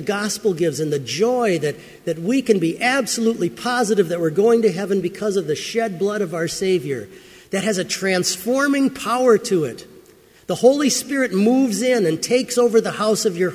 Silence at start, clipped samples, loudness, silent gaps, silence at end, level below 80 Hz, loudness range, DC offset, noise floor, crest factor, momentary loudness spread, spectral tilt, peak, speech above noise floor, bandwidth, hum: 0 s; under 0.1%; -19 LUFS; none; 0 s; -60 dBFS; 3 LU; under 0.1%; -49 dBFS; 18 dB; 7 LU; -4.5 dB/octave; -2 dBFS; 30 dB; 16 kHz; none